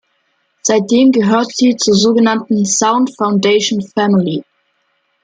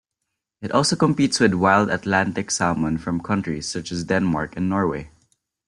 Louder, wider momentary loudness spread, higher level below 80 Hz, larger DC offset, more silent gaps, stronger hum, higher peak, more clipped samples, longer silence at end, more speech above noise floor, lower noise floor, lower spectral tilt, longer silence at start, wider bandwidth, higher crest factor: first, -13 LUFS vs -21 LUFS; second, 6 LU vs 9 LU; second, -58 dBFS vs -50 dBFS; neither; neither; neither; about the same, -2 dBFS vs -2 dBFS; neither; first, 0.8 s vs 0.6 s; second, 51 dB vs 60 dB; second, -63 dBFS vs -80 dBFS; about the same, -4 dB/octave vs -4.5 dB/octave; about the same, 0.65 s vs 0.6 s; second, 9.6 kHz vs 11.5 kHz; second, 12 dB vs 20 dB